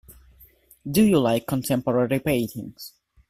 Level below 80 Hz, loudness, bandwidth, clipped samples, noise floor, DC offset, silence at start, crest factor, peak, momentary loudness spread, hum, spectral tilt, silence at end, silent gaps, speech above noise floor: -52 dBFS; -22 LUFS; 16 kHz; under 0.1%; -54 dBFS; under 0.1%; 0.1 s; 18 dB; -8 dBFS; 21 LU; none; -6 dB/octave; 0.4 s; none; 32 dB